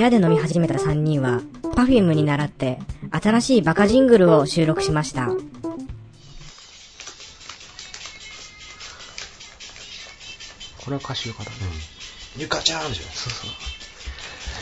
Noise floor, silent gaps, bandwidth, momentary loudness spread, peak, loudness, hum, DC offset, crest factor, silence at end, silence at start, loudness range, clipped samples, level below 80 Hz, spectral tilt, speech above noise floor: -45 dBFS; none; 10.5 kHz; 21 LU; -2 dBFS; -20 LUFS; none; under 0.1%; 20 dB; 0 s; 0 s; 19 LU; under 0.1%; -42 dBFS; -5.5 dB/octave; 25 dB